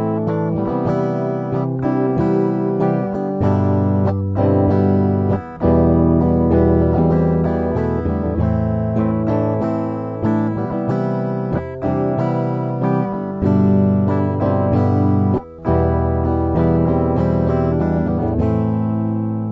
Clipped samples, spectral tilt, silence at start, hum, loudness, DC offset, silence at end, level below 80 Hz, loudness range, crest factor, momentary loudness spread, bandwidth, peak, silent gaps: under 0.1%; -11.5 dB/octave; 0 s; none; -18 LUFS; under 0.1%; 0 s; -32 dBFS; 4 LU; 14 dB; 6 LU; 5.8 kHz; -2 dBFS; none